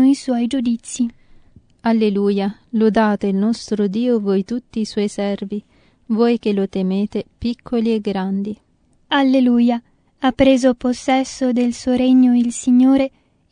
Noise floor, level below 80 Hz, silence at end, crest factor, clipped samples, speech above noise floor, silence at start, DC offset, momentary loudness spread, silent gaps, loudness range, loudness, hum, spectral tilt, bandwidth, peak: -48 dBFS; -48 dBFS; 0.45 s; 16 dB; under 0.1%; 31 dB; 0 s; under 0.1%; 11 LU; none; 5 LU; -18 LUFS; none; -6 dB/octave; 10.5 kHz; -2 dBFS